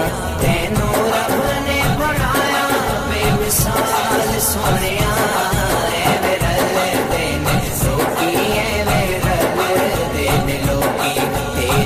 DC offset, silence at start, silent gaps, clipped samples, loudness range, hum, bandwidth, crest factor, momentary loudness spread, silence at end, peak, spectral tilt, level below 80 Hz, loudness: 0.2%; 0 s; none; under 0.1%; 1 LU; none; 15.5 kHz; 12 dB; 2 LU; 0 s; -4 dBFS; -4 dB/octave; -28 dBFS; -17 LUFS